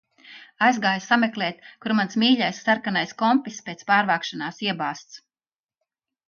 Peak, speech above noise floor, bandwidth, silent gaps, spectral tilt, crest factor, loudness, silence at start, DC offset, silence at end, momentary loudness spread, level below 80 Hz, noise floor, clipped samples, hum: -4 dBFS; over 67 dB; 7 kHz; none; -4 dB/octave; 20 dB; -22 LUFS; 0.25 s; under 0.1%; 1.1 s; 11 LU; -74 dBFS; under -90 dBFS; under 0.1%; none